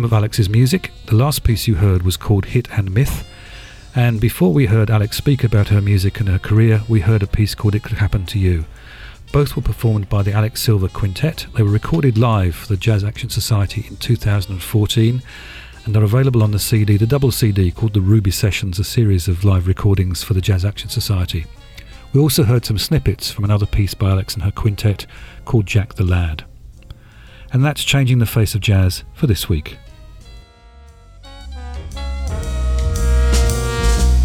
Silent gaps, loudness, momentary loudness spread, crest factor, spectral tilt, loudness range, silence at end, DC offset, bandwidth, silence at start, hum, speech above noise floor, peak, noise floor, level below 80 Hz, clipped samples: none; -17 LUFS; 10 LU; 14 dB; -6 dB/octave; 5 LU; 0 s; under 0.1%; 16 kHz; 0 s; none; 27 dB; -2 dBFS; -42 dBFS; -26 dBFS; under 0.1%